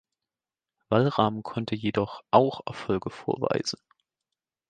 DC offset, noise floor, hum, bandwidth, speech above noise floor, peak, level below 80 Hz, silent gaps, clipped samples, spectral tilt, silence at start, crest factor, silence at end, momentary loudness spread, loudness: under 0.1%; under -90 dBFS; none; 9.6 kHz; over 64 dB; -4 dBFS; -60 dBFS; none; under 0.1%; -6 dB/octave; 0.9 s; 24 dB; 0.95 s; 11 LU; -27 LUFS